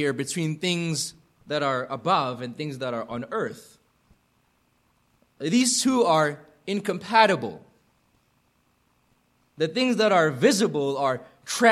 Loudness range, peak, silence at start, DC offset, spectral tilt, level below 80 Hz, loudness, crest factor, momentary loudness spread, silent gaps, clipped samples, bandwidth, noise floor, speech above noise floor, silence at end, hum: 7 LU; -4 dBFS; 0 s; under 0.1%; -4 dB/octave; -70 dBFS; -24 LUFS; 22 dB; 13 LU; none; under 0.1%; 13.5 kHz; -67 dBFS; 43 dB; 0 s; none